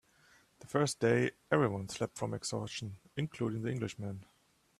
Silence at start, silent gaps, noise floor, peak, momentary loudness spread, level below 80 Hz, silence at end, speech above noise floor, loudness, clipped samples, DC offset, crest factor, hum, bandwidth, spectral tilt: 0.6 s; none; -66 dBFS; -14 dBFS; 13 LU; -68 dBFS; 0.55 s; 31 dB; -35 LUFS; under 0.1%; under 0.1%; 22 dB; none; 14 kHz; -5.5 dB/octave